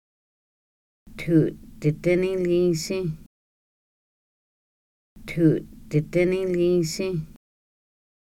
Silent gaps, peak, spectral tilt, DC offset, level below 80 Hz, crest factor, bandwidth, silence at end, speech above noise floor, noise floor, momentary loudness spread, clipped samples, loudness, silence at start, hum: 3.26-5.16 s; -8 dBFS; -6.5 dB/octave; under 0.1%; -50 dBFS; 18 dB; 15.5 kHz; 1 s; over 68 dB; under -90 dBFS; 11 LU; under 0.1%; -24 LUFS; 1.05 s; none